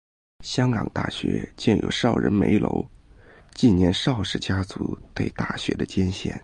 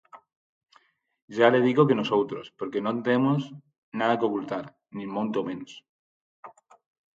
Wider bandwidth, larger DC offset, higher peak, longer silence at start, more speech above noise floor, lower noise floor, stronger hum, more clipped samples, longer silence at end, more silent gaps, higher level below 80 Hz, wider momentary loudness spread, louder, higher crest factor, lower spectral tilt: first, 10 kHz vs 7.6 kHz; neither; about the same, -6 dBFS vs -6 dBFS; first, 0.4 s vs 0.15 s; second, 27 dB vs 38 dB; second, -50 dBFS vs -63 dBFS; neither; neither; second, 0.05 s vs 0.65 s; second, none vs 0.36-0.61 s, 1.22-1.28 s, 3.78-3.92 s, 5.89-6.43 s; first, -40 dBFS vs -74 dBFS; second, 10 LU vs 18 LU; about the same, -24 LUFS vs -25 LUFS; second, 16 dB vs 22 dB; second, -6 dB/octave vs -7.5 dB/octave